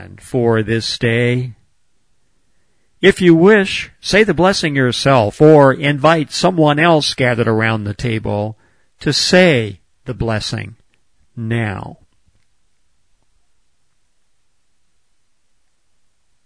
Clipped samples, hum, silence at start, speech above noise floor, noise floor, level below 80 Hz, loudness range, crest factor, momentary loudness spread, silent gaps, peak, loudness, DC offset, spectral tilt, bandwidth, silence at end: under 0.1%; none; 0 s; 53 dB; -66 dBFS; -44 dBFS; 15 LU; 16 dB; 14 LU; none; 0 dBFS; -14 LUFS; 0.2%; -5.5 dB/octave; 11 kHz; 4.5 s